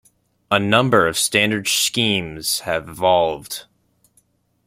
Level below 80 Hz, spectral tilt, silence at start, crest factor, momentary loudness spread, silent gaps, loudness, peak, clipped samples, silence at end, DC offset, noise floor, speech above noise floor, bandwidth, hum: -54 dBFS; -3 dB/octave; 0.5 s; 20 dB; 9 LU; none; -18 LUFS; 0 dBFS; under 0.1%; 1.05 s; under 0.1%; -62 dBFS; 43 dB; 16.5 kHz; none